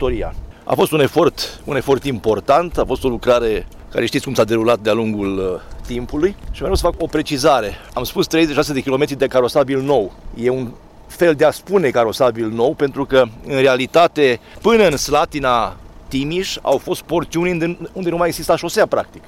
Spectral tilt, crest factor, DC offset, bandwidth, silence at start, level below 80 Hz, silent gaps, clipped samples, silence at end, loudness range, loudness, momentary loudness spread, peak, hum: -5 dB/octave; 14 dB; under 0.1%; 16.5 kHz; 0 s; -34 dBFS; none; under 0.1%; 0.1 s; 4 LU; -17 LUFS; 10 LU; -4 dBFS; none